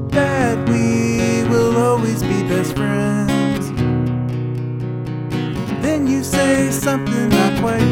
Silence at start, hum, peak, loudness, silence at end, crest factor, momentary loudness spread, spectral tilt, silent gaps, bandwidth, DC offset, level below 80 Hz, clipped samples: 0 s; none; -2 dBFS; -18 LUFS; 0 s; 14 dB; 8 LU; -6 dB/octave; none; 17 kHz; under 0.1%; -38 dBFS; under 0.1%